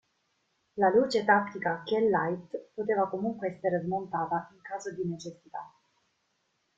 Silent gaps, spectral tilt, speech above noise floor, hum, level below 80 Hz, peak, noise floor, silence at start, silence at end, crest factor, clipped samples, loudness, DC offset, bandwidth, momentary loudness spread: none; -6 dB/octave; 47 dB; none; -72 dBFS; -10 dBFS; -76 dBFS; 0.75 s; 1.1 s; 20 dB; under 0.1%; -29 LUFS; under 0.1%; 7.8 kHz; 16 LU